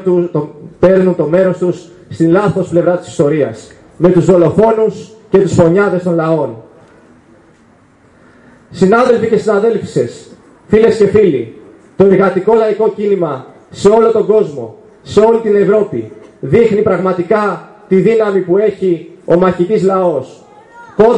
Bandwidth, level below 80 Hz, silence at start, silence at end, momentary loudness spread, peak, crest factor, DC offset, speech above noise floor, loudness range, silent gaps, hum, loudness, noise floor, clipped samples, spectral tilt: 10 kHz; -46 dBFS; 0 s; 0 s; 11 LU; 0 dBFS; 12 dB; under 0.1%; 36 dB; 3 LU; none; none; -11 LUFS; -46 dBFS; under 0.1%; -7.5 dB/octave